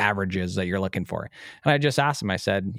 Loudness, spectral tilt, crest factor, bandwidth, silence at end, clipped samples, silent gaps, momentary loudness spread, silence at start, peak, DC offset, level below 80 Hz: -25 LUFS; -5.5 dB/octave; 20 dB; 16 kHz; 0 s; under 0.1%; none; 11 LU; 0 s; -4 dBFS; under 0.1%; -62 dBFS